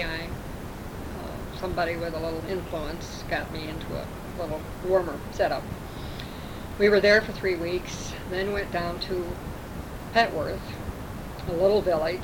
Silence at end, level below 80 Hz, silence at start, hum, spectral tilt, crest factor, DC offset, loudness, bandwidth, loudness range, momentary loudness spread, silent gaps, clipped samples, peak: 0 s; -42 dBFS; 0 s; none; -5.5 dB/octave; 20 dB; under 0.1%; -28 LUFS; over 20 kHz; 6 LU; 15 LU; none; under 0.1%; -8 dBFS